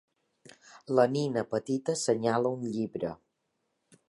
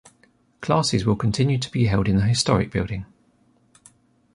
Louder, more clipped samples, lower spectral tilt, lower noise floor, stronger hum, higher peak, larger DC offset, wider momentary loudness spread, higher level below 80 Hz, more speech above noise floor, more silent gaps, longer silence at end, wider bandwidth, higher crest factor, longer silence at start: second, -30 LUFS vs -21 LUFS; neither; about the same, -5.5 dB/octave vs -5.5 dB/octave; first, -79 dBFS vs -61 dBFS; neither; second, -10 dBFS vs -4 dBFS; neither; about the same, 9 LU vs 9 LU; second, -72 dBFS vs -42 dBFS; first, 51 dB vs 40 dB; neither; second, 0.95 s vs 1.3 s; about the same, 11.5 kHz vs 11.5 kHz; about the same, 20 dB vs 18 dB; about the same, 0.7 s vs 0.6 s